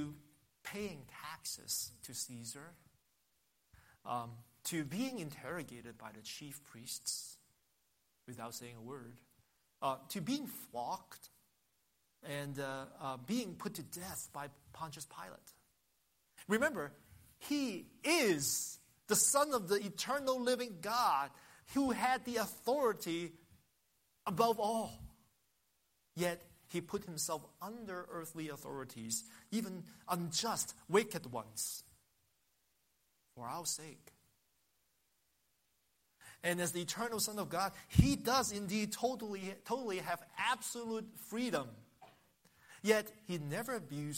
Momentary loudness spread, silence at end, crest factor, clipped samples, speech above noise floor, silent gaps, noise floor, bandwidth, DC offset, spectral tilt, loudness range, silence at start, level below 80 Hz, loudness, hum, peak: 17 LU; 0 s; 28 dB; under 0.1%; 41 dB; none; -79 dBFS; 16 kHz; under 0.1%; -3.5 dB/octave; 12 LU; 0 s; -60 dBFS; -38 LUFS; none; -12 dBFS